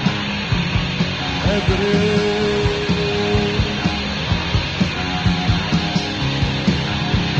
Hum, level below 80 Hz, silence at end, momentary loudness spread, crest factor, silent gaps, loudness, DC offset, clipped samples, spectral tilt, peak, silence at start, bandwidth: none; -30 dBFS; 0 s; 3 LU; 14 dB; none; -19 LUFS; under 0.1%; under 0.1%; -5.5 dB/octave; -4 dBFS; 0 s; 8.4 kHz